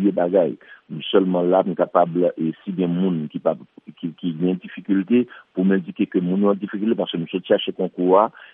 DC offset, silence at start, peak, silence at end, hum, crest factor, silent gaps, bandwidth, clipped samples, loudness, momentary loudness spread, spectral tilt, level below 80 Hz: under 0.1%; 0 s; -2 dBFS; 0.1 s; none; 18 dB; none; 3.8 kHz; under 0.1%; -21 LUFS; 10 LU; -11 dB/octave; -74 dBFS